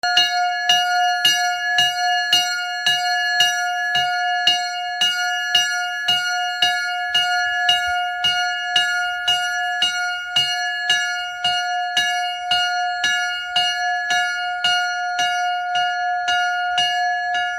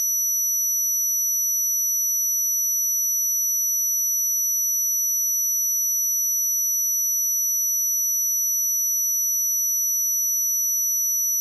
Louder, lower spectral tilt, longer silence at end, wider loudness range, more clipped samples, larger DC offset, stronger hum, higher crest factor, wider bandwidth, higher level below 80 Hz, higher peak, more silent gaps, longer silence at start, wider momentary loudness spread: about the same, -18 LUFS vs -19 LUFS; first, 1.5 dB/octave vs 9 dB/octave; about the same, 0 s vs 0 s; about the same, 2 LU vs 0 LU; neither; neither; neither; first, 18 dB vs 4 dB; first, 16 kHz vs 12.5 kHz; first, -62 dBFS vs under -90 dBFS; first, -2 dBFS vs -18 dBFS; neither; about the same, 0.05 s vs 0 s; first, 5 LU vs 0 LU